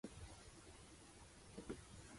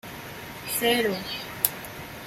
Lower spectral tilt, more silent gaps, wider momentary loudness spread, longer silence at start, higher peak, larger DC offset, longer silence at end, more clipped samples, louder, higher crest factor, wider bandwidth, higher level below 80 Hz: first, -4.5 dB/octave vs -2.5 dB/octave; neither; second, 7 LU vs 15 LU; about the same, 0.05 s vs 0.05 s; second, -36 dBFS vs 0 dBFS; neither; about the same, 0 s vs 0 s; neither; second, -58 LUFS vs -26 LUFS; second, 22 dB vs 30 dB; second, 11.5 kHz vs 16.5 kHz; second, -66 dBFS vs -56 dBFS